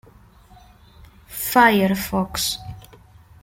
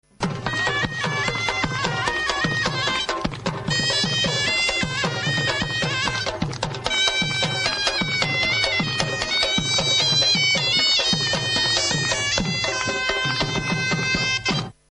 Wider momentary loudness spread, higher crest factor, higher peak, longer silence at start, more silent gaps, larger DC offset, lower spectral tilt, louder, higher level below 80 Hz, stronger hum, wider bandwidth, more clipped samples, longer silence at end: first, 18 LU vs 7 LU; about the same, 22 dB vs 20 dB; about the same, -2 dBFS vs -2 dBFS; first, 1.3 s vs 0.2 s; neither; neither; first, -4 dB/octave vs -2.5 dB/octave; about the same, -19 LUFS vs -20 LUFS; about the same, -48 dBFS vs -44 dBFS; neither; first, 16.5 kHz vs 10.5 kHz; neither; first, 0.6 s vs 0.25 s